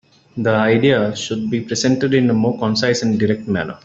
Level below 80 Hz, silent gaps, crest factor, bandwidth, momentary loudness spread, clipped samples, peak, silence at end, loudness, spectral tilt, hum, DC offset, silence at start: -54 dBFS; none; 14 dB; 8 kHz; 8 LU; under 0.1%; -2 dBFS; 0.1 s; -17 LUFS; -5.5 dB/octave; none; under 0.1%; 0.35 s